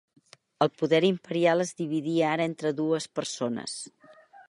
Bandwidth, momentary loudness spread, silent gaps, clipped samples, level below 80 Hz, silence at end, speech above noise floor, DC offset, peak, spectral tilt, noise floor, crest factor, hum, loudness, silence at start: 11.5 kHz; 10 LU; none; under 0.1%; -76 dBFS; 0.35 s; 27 dB; under 0.1%; -8 dBFS; -5 dB/octave; -54 dBFS; 20 dB; none; -27 LUFS; 0.6 s